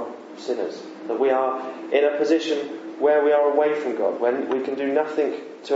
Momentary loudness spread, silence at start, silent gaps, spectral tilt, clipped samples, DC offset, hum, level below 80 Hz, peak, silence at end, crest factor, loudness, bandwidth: 12 LU; 0 s; none; -4.5 dB/octave; under 0.1%; under 0.1%; none; -88 dBFS; -6 dBFS; 0 s; 16 dB; -22 LUFS; 8 kHz